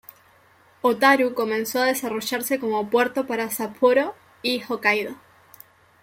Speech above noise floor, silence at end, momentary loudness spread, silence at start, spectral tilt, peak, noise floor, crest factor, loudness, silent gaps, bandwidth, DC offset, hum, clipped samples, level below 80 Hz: 34 dB; 0.85 s; 8 LU; 0.85 s; -3 dB/octave; -4 dBFS; -56 dBFS; 20 dB; -22 LUFS; none; 16.5 kHz; under 0.1%; none; under 0.1%; -70 dBFS